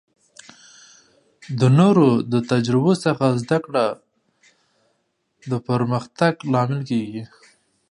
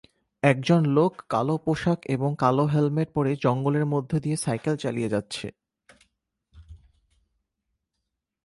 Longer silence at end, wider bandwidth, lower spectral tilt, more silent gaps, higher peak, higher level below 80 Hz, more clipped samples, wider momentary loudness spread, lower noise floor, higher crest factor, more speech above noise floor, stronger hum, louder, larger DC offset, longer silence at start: second, 0.65 s vs 1.7 s; about the same, 11 kHz vs 11.5 kHz; about the same, -7.5 dB/octave vs -7 dB/octave; neither; first, -2 dBFS vs -6 dBFS; about the same, -62 dBFS vs -58 dBFS; neither; first, 14 LU vs 6 LU; second, -70 dBFS vs -82 dBFS; about the same, 18 dB vs 20 dB; second, 51 dB vs 58 dB; neither; first, -20 LUFS vs -25 LUFS; neither; first, 1.45 s vs 0.45 s